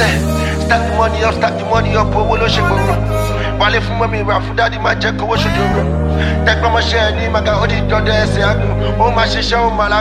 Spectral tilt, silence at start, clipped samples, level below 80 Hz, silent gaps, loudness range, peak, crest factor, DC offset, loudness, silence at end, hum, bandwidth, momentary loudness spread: -5.5 dB/octave; 0 s; under 0.1%; -22 dBFS; none; 1 LU; 0 dBFS; 14 dB; under 0.1%; -14 LUFS; 0 s; none; 15 kHz; 3 LU